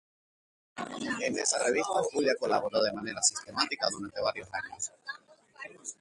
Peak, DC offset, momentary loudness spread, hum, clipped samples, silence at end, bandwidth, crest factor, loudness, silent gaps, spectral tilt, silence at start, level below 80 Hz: -10 dBFS; under 0.1%; 16 LU; none; under 0.1%; 0.05 s; 11.5 kHz; 22 dB; -30 LUFS; none; -1.5 dB/octave; 0.75 s; -70 dBFS